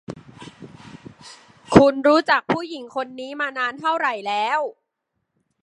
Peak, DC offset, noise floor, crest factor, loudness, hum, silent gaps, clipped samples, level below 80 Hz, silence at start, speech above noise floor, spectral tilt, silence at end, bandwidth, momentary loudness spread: 0 dBFS; under 0.1%; -77 dBFS; 22 dB; -20 LUFS; none; none; under 0.1%; -52 dBFS; 0.1 s; 57 dB; -6 dB/octave; 0.95 s; 11.5 kHz; 26 LU